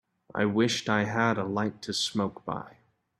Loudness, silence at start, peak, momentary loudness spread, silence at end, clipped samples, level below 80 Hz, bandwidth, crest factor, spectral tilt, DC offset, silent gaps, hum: -29 LUFS; 0.35 s; -10 dBFS; 12 LU; 0.5 s; under 0.1%; -66 dBFS; 13 kHz; 20 dB; -4.5 dB/octave; under 0.1%; none; none